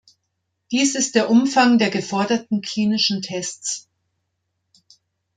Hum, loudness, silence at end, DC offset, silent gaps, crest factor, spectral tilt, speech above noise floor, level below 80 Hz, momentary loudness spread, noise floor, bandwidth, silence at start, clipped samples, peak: none; -19 LUFS; 1.55 s; under 0.1%; none; 18 dB; -3.5 dB/octave; 56 dB; -68 dBFS; 11 LU; -75 dBFS; 9.6 kHz; 0.7 s; under 0.1%; -4 dBFS